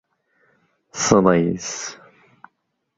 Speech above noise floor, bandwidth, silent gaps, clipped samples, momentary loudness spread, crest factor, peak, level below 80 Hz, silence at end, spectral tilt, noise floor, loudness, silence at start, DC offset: 54 dB; 8 kHz; none; under 0.1%; 17 LU; 22 dB; 0 dBFS; -52 dBFS; 1.05 s; -4.5 dB/octave; -72 dBFS; -19 LUFS; 0.95 s; under 0.1%